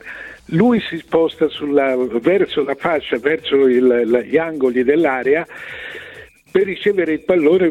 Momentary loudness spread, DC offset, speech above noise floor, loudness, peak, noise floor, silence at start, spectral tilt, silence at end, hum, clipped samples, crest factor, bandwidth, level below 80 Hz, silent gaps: 15 LU; under 0.1%; 24 dB; -16 LUFS; -2 dBFS; -40 dBFS; 0.05 s; -7.5 dB/octave; 0 s; none; under 0.1%; 14 dB; 9.6 kHz; -54 dBFS; none